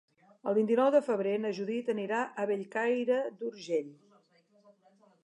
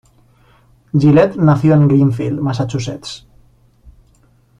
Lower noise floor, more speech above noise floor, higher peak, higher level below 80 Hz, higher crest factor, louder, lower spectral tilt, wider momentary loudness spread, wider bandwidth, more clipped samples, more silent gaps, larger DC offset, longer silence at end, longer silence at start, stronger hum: first, -67 dBFS vs -52 dBFS; about the same, 36 dB vs 39 dB; second, -14 dBFS vs -2 dBFS; second, -90 dBFS vs -46 dBFS; about the same, 18 dB vs 14 dB; second, -31 LUFS vs -14 LUFS; second, -6 dB/octave vs -8 dB/octave; second, 9 LU vs 16 LU; first, 10.5 kHz vs 9 kHz; neither; neither; neither; first, 1.3 s vs 0.7 s; second, 0.45 s vs 0.95 s; neither